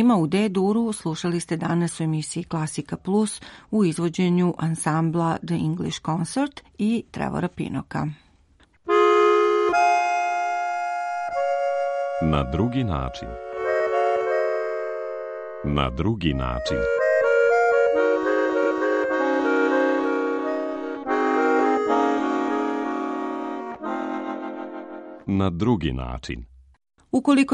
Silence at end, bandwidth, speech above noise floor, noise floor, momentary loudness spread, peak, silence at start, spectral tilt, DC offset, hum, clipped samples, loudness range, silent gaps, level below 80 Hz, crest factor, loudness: 0 s; 11.5 kHz; 35 dB; -58 dBFS; 11 LU; -6 dBFS; 0 s; -6 dB/octave; under 0.1%; none; under 0.1%; 6 LU; none; -42 dBFS; 18 dB; -23 LUFS